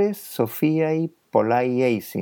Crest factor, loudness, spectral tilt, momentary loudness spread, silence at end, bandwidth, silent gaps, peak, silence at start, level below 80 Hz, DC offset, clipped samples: 18 dB; -22 LUFS; -7 dB/octave; 6 LU; 0 s; 19.5 kHz; none; -4 dBFS; 0 s; -78 dBFS; under 0.1%; under 0.1%